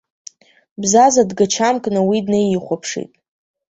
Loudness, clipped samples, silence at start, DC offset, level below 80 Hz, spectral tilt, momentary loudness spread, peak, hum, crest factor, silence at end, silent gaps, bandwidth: -16 LUFS; under 0.1%; 0.8 s; under 0.1%; -58 dBFS; -4 dB/octave; 13 LU; -2 dBFS; none; 16 dB; 0.7 s; none; 8.2 kHz